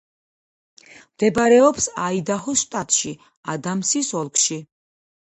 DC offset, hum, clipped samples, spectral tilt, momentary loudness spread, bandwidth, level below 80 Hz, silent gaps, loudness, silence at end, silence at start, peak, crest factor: under 0.1%; none; under 0.1%; -3 dB/octave; 14 LU; 11 kHz; -58 dBFS; 3.37-3.43 s; -19 LUFS; 0.55 s; 1.2 s; -2 dBFS; 20 dB